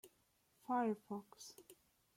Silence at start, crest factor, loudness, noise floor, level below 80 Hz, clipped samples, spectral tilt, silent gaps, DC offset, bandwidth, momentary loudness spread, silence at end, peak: 0.05 s; 18 dB; -42 LUFS; -78 dBFS; -88 dBFS; under 0.1%; -5.5 dB/octave; none; under 0.1%; 16.5 kHz; 20 LU; 0.45 s; -28 dBFS